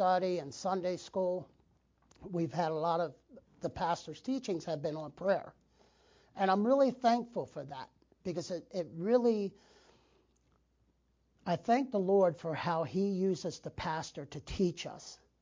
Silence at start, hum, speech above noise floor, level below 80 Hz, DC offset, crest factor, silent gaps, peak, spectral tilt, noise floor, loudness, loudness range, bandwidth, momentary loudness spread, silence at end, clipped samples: 0 s; none; 40 dB; -64 dBFS; under 0.1%; 18 dB; none; -16 dBFS; -6 dB/octave; -74 dBFS; -34 LUFS; 4 LU; 7.6 kHz; 15 LU; 0.25 s; under 0.1%